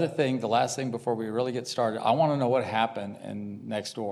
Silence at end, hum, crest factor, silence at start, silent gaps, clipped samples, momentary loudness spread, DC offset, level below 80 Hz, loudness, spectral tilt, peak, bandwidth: 0 s; none; 18 dB; 0 s; none; under 0.1%; 13 LU; under 0.1%; -78 dBFS; -28 LUFS; -5.5 dB/octave; -10 dBFS; 13 kHz